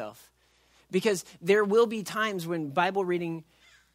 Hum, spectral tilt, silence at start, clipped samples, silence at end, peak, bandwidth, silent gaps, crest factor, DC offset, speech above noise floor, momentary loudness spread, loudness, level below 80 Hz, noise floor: none; -5 dB/octave; 0 s; under 0.1%; 0.5 s; -10 dBFS; 16 kHz; none; 18 dB; under 0.1%; 38 dB; 10 LU; -27 LUFS; -72 dBFS; -65 dBFS